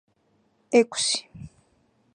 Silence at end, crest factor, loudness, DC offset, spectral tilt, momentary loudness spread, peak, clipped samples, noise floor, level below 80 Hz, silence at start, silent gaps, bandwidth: 0.65 s; 22 dB; -23 LUFS; under 0.1%; -2.5 dB/octave; 24 LU; -6 dBFS; under 0.1%; -67 dBFS; -62 dBFS; 0.7 s; none; 11 kHz